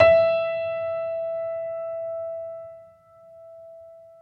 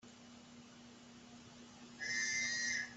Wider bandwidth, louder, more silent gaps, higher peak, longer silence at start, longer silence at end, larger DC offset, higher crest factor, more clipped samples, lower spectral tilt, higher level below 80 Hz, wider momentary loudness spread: second, 5.8 kHz vs 8.2 kHz; first, -26 LUFS vs -37 LUFS; neither; first, -4 dBFS vs -28 dBFS; about the same, 0 s vs 0.05 s; first, 0.15 s vs 0 s; neither; first, 22 dB vs 16 dB; neither; first, -6.5 dB/octave vs 0 dB/octave; first, -58 dBFS vs -78 dBFS; about the same, 24 LU vs 22 LU